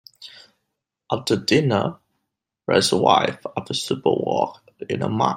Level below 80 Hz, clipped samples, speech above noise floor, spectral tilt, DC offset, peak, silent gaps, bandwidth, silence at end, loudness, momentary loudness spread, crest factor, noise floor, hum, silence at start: -62 dBFS; under 0.1%; 59 dB; -4.5 dB/octave; under 0.1%; -2 dBFS; none; 16 kHz; 0 s; -21 LUFS; 17 LU; 20 dB; -79 dBFS; none; 0.2 s